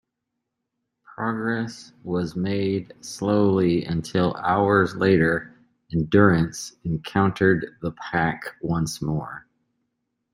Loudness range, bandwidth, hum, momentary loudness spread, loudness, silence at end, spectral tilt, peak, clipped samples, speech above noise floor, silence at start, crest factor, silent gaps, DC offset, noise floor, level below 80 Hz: 5 LU; 16 kHz; none; 12 LU; -23 LUFS; 0.95 s; -6.5 dB/octave; -4 dBFS; under 0.1%; 59 dB; 1.2 s; 20 dB; none; under 0.1%; -81 dBFS; -52 dBFS